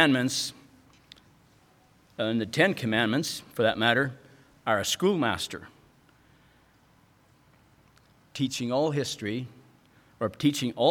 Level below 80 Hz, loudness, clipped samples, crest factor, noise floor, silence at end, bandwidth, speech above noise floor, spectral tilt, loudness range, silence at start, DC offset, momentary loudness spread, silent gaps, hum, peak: -66 dBFS; -27 LUFS; under 0.1%; 24 dB; -61 dBFS; 0 s; 19 kHz; 35 dB; -4 dB/octave; 9 LU; 0 s; under 0.1%; 11 LU; none; none; -6 dBFS